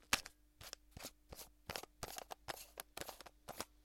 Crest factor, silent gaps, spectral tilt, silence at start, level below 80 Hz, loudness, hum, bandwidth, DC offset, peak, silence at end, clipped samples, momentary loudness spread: 38 dB; none; -1 dB/octave; 0 s; -66 dBFS; -49 LUFS; none; 16.5 kHz; under 0.1%; -12 dBFS; 0 s; under 0.1%; 10 LU